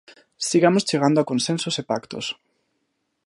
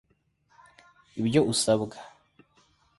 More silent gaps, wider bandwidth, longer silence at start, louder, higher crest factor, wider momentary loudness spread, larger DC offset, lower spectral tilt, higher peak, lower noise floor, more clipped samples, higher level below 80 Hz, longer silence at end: neither; about the same, 11.5 kHz vs 11.5 kHz; second, 0.4 s vs 1.15 s; first, -22 LUFS vs -26 LUFS; about the same, 20 dB vs 22 dB; second, 12 LU vs 19 LU; neither; about the same, -4.5 dB/octave vs -4.5 dB/octave; first, -4 dBFS vs -8 dBFS; first, -74 dBFS vs -69 dBFS; neither; about the same, -68 dBFS vs -64 dBFS; about the same, 0.95 s vs 0.9 s